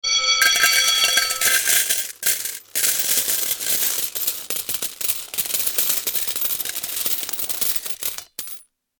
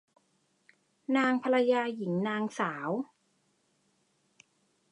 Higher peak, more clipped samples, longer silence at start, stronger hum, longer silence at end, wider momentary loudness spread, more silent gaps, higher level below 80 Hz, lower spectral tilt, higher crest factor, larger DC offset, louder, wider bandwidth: first, 0 dBFS vs -14 dBFS; neither; second, 0.05 s vs 1.1 s; neither; second, 0.35 s vs 1.9 s; about the same, 10 LU vs 10 LU; neither; first, -60 dBFS vs -84 dBFS; second, 2.5 dB/octave vs -6 dB/octave; about the same, 22 dB vs 18 dB; neither; first, -18 LUFS vs -30 LUFS; first, 19.5 kHz vs 10.5 kHz